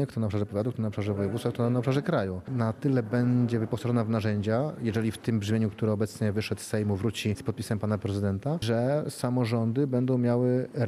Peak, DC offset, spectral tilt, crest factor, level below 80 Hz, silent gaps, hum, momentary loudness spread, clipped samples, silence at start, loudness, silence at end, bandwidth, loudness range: -12 dBFS; under 0.1%; -7.5 dB/octave; 16 dB; -62 dBFS; none; none; 5 LU; under 0.1%; 0 s; -28 LUFS; 0 s; 14.5 kHz; 2 LU